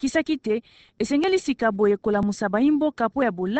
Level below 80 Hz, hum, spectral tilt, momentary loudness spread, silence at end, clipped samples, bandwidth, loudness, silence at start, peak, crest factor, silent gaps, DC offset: -54 dBFS; none; -5.5 dB/octave; 5 LU; 0 s; under 0.1%; 8.8 kHz; -23 LUFS; 0 s; -8 dBFS; 16 dB; none; under 0.1%